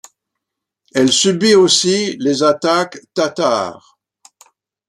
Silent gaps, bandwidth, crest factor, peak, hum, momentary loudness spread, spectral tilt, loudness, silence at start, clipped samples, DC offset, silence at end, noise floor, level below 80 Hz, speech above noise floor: none; 12.5 kHz; 16 dB; 0 dBFS; none; 10 LU; -3 dB/octave; -14 LUFS; 0.95 s; under 0.1%; under 0.1%; 1.15 s; -79 dBFS; -62 dBFS; 65 dB